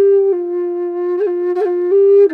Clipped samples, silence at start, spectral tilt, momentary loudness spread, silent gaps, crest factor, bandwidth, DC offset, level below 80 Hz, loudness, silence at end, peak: under 0.1%; 0 s; -7 dB/octave; 9 LU; none; 10 dB; 3 kHz; under 0.1%; -66 dBFS; -15 LUFS; 0 s; -4 dBFS